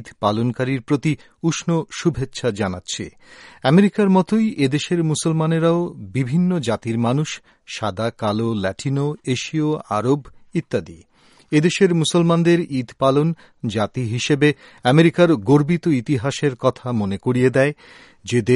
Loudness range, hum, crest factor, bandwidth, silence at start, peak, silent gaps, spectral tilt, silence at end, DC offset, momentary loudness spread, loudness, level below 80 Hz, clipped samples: 5 LU; none; 18 dB; 11.5 kHz; 0 s; -2 dBFS; none; -6 dB/octave; 0 s; under 0.1%; 10 LU; -20 LUFS; -52 dBFS; under 0.1%